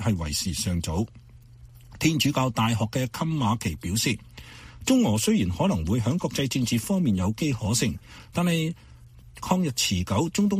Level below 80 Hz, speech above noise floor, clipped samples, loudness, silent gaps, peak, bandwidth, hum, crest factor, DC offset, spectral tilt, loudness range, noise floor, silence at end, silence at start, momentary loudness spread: -46 dBFS; 23 dB; under 0.1%; -25 LUFS; none; -6 dBFS; 15.5 kHz; none; 18 dB; under 0.1%; -5 dB/octave; 2 LU; -48 dBFS; 0 s; 0 s; 10 LU